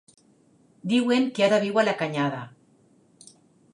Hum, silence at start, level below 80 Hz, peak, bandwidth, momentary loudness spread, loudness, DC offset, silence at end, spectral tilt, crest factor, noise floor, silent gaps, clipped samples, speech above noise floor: none; 0.85 s; -78 dBFS; -8 dBFS; 11 kHz; 16 LU; -23 LUFS; under 0.1%; 1.25 s; -5.5 dB/octave; 18 dB; -60 dBFS; none; under 0.1%; 37 dB